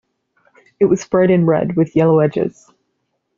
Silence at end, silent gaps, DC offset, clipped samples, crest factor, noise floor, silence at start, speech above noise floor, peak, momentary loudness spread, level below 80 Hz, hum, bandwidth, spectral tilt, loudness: 0.9 s; none; under 0.1%; under 0.1%; 16 dB; -70 dBFS; 0.8 s; 56 dB; -2 dBFS; 6 LU; -54 dBFS; none; 7.4 kHz; -8.5 dB/octave; -15 LUFS